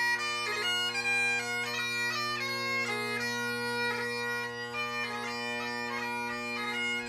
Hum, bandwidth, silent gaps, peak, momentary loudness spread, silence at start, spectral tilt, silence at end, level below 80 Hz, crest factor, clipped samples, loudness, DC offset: none; 15.5 kHz; none; -18 dBFS; 6 LU; 0 s; -2 dB/octave; 0 s; -70 dBFS; 14 dB; under 0.1%; -31 LUFS; under 0.1%